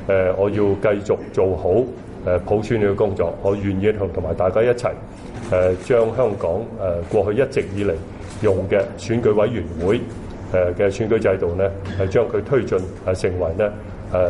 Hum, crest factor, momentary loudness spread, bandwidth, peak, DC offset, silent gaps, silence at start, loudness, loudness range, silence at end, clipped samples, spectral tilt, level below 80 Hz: none; 14 dB; 6 LU; 11 kHz; -6 dBFS; under 0.1%; none; 0 s; -20 LUFS; 1 LU; 0 s; under 0.1%; -7.5 dB/octave; -40 dBFS